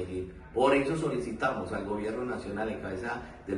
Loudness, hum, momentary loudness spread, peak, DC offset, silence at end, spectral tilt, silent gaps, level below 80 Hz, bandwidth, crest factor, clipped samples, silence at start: -31 LUFS; none; 11 LU; -12 dBFS; under 0.1%; 0 s; -6 dB/octave; none; -52 dBFS; 11 kHz; 20 dB; under 0.1%; 0 s